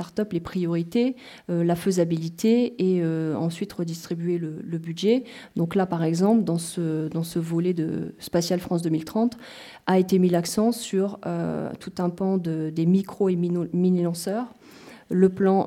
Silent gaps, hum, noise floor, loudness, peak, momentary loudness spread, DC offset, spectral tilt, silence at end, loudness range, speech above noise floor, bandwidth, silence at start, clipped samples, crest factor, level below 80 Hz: none; none; -47 dBFS; -25 LUFS; -6 dBFS; 9 LU; under 0.1%; -7 dB/octave; 0 s; 2 LU; 23 dB; 16 kHz; 0 s; under 0.1%; 18 dB; -62 dBFS